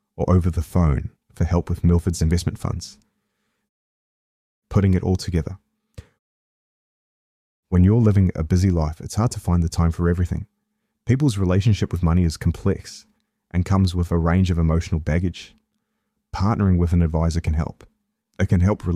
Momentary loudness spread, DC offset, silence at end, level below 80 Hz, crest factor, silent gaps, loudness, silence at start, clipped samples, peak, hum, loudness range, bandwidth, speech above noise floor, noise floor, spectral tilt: 10 LU; under 0.1%; 0 s; -32 dBFS; 16 dB; 3.69-4.62 s, 6.19-7.63 s; -21 LUFS; 0.2 s; under 0.1%; -4 dBFS; none; 6 LU; 12 kHz; 56 dB; -75 dBFS; -7.5 dB/octave